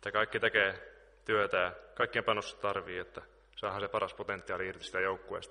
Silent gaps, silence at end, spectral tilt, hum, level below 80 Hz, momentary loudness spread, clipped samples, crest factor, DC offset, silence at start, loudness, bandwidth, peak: none; 0 s; -4 dB/octave; none; -64 dBFS; 13 LU; under 0.1%; 22 dB; under 0.1%; 0 s; -34 LUFS; 10.5 kHz; -12 dBFS